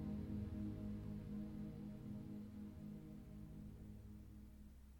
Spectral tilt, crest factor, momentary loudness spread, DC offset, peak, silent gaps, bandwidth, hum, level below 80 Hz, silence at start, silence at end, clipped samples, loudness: -9 dB/octave; 14 dB; 11 LU; under 0.1%; -36 dBFS; none; 19 kHz; none; -60 dBFS; 0 s; 0 s; under 0.1%; -52 LUFS